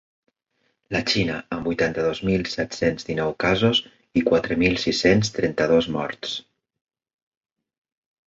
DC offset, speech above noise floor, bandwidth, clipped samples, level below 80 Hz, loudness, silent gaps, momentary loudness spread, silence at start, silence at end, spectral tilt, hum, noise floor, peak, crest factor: under 0.1%; 49 dB; 7.8 kHz; under 0.1%; -48 dBFS; -22 LUFS; none; 9 LU; 0.9 s; 1.9 s; -5 dB/octave; none; -71 dBFS; -4 dBFS; 20 dB